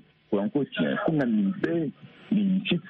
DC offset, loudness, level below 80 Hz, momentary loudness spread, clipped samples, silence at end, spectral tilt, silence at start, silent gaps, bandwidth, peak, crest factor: under 0.1%; -27 LUFS; -66 dBFS; 5 LU; under 0.1%; 0 s; -9 dB/octave; 0.3 s; none; 4.5 kHz; -12 dBFS; 14 dB